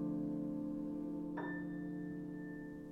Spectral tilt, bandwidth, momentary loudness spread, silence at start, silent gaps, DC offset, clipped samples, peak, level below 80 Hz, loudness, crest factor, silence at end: -9.5 dB/octave; 3.8 kHz; 6 LU; 0 s; none; under 0.1%; under 0.1%; -30 dBFS; -66 dBFS; -43 LUFS; 12 dB; 0 s